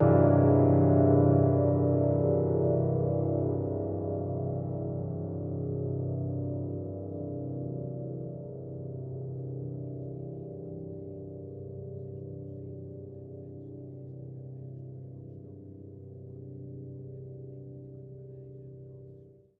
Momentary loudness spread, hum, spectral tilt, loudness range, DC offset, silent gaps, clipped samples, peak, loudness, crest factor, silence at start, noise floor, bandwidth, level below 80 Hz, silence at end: 24 LU; none; -13.5 dB/octave; 19 LU; under 0.1%; none; under 0.1%; -10 dBFS; -29 LUFS; 20 dB; 0 s; -53 dBFS; 2.5 kHz; -58 dBFS; 0.25 s